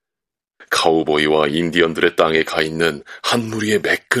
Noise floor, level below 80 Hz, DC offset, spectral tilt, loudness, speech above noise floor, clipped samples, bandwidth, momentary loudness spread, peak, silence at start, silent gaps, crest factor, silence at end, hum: -86 dBFS; -54 dBFS; under 0.1%; -4 dB/octave; -17 LUFS; 69 dB; under 0.1%; 15.5 kHz; 5 LU; 0 dBFS; 0.6 s; none; 18 dB; 0 s; none